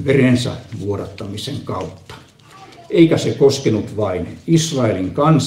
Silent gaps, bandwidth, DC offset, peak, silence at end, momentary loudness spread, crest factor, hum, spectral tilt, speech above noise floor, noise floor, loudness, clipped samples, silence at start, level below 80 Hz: none; 15 kHz; under 0.1%; 0 dBFS; 0 s; 13 LU; 18 dB; none; -6 dB/octave; 26 dB; -43 dBFS; -18 LUFS; under 0.1%; 0 s; -48 dBFS